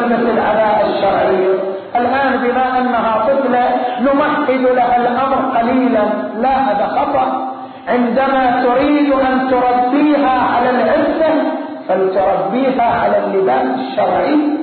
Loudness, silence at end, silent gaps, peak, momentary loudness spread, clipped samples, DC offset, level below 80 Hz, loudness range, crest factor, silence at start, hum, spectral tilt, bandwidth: -14 LUFS; 0 s; none; -4 dBFS; 4 LU; under 0.1%; under 0.1%; -46 dBFS; 2 LU; 10 dB; 0 s; none; -11 dB/octave; 4.5 kHz